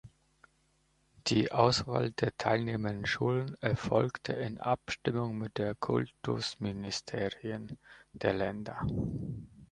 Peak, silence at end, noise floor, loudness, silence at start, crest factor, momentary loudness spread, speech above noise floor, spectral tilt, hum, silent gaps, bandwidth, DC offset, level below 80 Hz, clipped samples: -10 dBFS; 0.05 s; -72 dBFS; -33 LUFS; 0.05 s; 24 dB; 8 LU; 39 dB; -5.5 dB/octave; none; none; 10.5 kHz; under 0.1%; -56 dBFS; under 0.1%